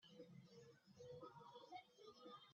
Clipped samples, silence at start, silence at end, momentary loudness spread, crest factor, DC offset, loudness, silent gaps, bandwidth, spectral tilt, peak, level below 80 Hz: under 0.1%; 0 s; 0 s; 7 LU; 16 dB; under 0.1%; -63 LUFS; none; 7 kHz; -4 dB/octave; -46 dBFS; under -90 dBFS